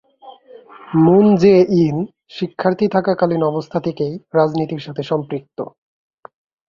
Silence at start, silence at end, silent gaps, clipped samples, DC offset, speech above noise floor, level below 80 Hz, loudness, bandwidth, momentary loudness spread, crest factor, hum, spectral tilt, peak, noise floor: 0.25 s; 1 s; none; under 0.1%; under 0.1%; 27 dB; -56 dBFS; -17 LUFS; 7 kHz; 16 LU; 16 dB; none; -8.5 dB/octave; -2 dBFS; -42 dBFS